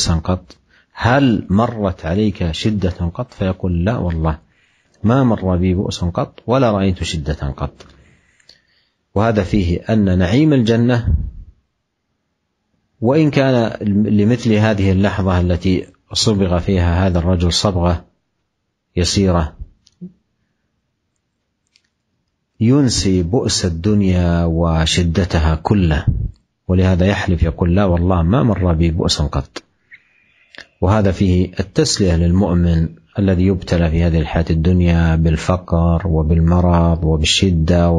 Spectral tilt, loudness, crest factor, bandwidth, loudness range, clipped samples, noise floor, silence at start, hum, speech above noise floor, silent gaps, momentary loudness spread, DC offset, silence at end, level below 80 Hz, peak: -6 dB/octave; -16 LUFS; 16 dB; 10.5 kHz; 5 LU; under 0.1%; -71 dBFS; 0 s; none; 56 dB; none; 8 LU; under 0.1%; 0 s; -28 dBFS; 0 dBFS